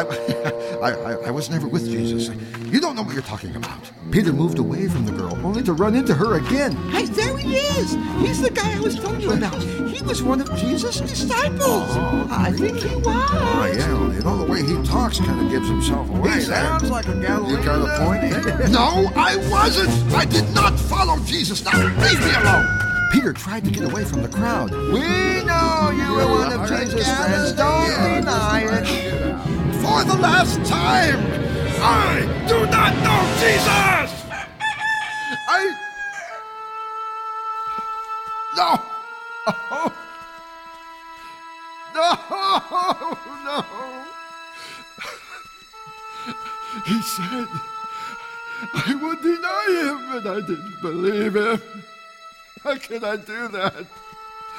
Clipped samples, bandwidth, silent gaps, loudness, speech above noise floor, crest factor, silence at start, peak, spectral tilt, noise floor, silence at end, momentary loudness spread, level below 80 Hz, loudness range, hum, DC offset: under 0.1%; 17 kHz; none; -20 LUFS; 24 dB; 18 dB; 0 s; -2 dBFS; -5 dB/octave; -43 dBFS; 0 s; 16 LU; -32 dBFS; 9 LU; none; under 0.1%